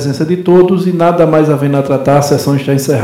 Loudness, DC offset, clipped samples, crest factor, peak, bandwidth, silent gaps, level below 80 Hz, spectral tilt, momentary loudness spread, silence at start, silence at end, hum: -10 LUFS; under 0.1%; 0.5%; 10 dB; 0 dBFS; 16 kHz; none; -48 dBFS; -7 dB/octave; 4 LU; 0 s; 0 s; none